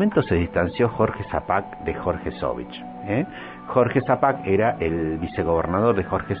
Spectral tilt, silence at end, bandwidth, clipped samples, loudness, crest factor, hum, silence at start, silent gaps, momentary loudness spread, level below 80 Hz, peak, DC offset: -11.5 dB/octave; 0 s; 5 kHz; under 0.1%; -23 LUFS; 18 dB; none; 0 s; none; 8 LU; -42 dBFS; -4 dBFS; under 0.1%